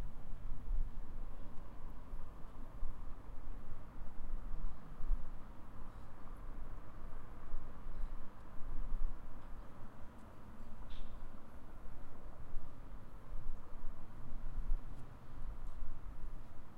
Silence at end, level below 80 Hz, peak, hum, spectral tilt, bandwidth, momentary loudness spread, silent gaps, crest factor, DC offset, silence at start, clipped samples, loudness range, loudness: 0 s; -42 dBFS; -22 dBFS; none; -7.5 dB/octave; 2.4 kHz; 9 LU; none; 14 dB; under 0.1%; 0 s; under 0.1%; 4 LU; -53 LUFS